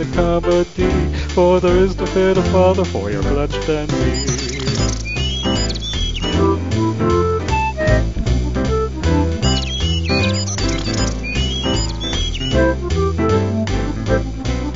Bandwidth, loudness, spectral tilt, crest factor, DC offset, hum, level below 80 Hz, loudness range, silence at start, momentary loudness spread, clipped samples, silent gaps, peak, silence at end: 7.8 kHz; -18 LUFS; -5.5 dB/octave; 16 dB; 0.9%; none; -24 dBFS; 3 LU; 0 s; 6 LU; under 0.1%; none; -2 dBFS; 0 s